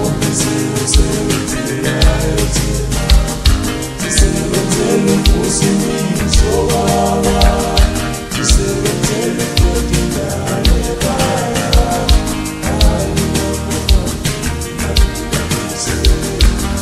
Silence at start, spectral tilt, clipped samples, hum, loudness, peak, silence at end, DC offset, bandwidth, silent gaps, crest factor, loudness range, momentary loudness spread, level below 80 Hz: 0 s; -4.5 dB/octave; under 0.1%; none; -14 LUFS; 0 dBFS; 0 s; under 0.1%; 13.5 kHz; none; 14 dB; 3 LU; 5 LU; -16 dBFS